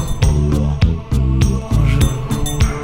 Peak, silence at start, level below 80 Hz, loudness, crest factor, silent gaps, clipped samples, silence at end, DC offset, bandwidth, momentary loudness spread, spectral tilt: -2 dBFS; 0 s; -18 dBFS; -17 LUFS; 14 dB; none; under 0.1%; 0 s; under 0.1%; 16.5 kHz; 3 LU; -6 dB/octave